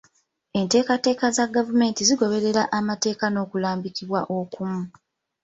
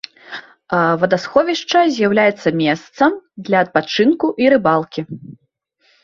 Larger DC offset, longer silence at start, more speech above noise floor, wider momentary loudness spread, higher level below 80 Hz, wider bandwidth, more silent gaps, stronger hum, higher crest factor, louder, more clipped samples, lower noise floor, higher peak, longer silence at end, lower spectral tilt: neither; first, 0.55 s vs 0.3 s; second, 41 dB vs 45 dB; second, 10 LU vs 17 LU; second, -64 dBFS vs -58 dBFS; first, 8.2 kHz vs 7.4 kHz; neither; neither; about the same, 18 dB vs 16 dB; second, -23 LUFS vs -16 LUFS; neither; about the same, -63 dBFS vs -61 dBFS; second, -6 dBFS vs 0 dBFS; second, 0.55 s vs 0.7 s; second, -4 dB/octave vs -5.5 dB/octave